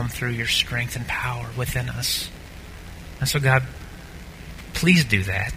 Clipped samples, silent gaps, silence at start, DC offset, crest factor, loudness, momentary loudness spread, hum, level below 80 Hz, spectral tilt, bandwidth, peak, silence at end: under 0.1%; none; 0 s; under 0.1%; 22 dB; -22 LUFS; 22 LU; none; -40 dBFS; -4 dB/octave; 16 kHz; -2 dBFS; 0 s